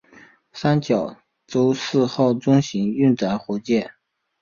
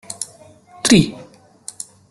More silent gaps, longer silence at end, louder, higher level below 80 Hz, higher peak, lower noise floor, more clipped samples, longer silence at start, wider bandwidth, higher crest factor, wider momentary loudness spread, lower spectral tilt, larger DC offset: neither; second, 0.5 s vs 0.85 s; second, -21 LUFS vs -17 LUFS; second, -58 dBFS vs -48 dBFS; second, -4 dBFS vs 0 dBFS; first, -50 dBFS vs -45 dBFS; neither; first, 0.55 s vs 0.1 s; second, 7.4 kHz vs 12.5 kHz; about the same, 16 dB vs 20 dB; second, 8 LU vs 23 LU; first, -7 dB/octave vs -4 dB/octave; neither